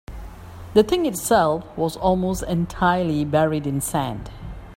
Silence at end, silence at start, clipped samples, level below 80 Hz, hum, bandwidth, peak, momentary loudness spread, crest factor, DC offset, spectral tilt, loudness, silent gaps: 0 s; 0.1 s; under 0.1%; -40 dBFS; none; 16.5 kHz; -4 dBFS; 19 LU; 18 dB; under 0.1%; -5.5 dB/octave; -21 LUFS; none